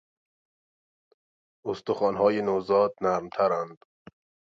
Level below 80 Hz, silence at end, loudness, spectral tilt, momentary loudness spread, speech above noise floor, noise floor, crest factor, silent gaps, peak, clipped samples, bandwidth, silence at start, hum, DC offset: -66 dBFS; 0.75 s; -26 LUFS; -6.5 dB/octave; 11 LU; over 65 dB; under -90 dBFS; 20 dB; none; -8 dBFS; under 0.1%; 7.4 kHz; 1.65 s; none; under 0.1%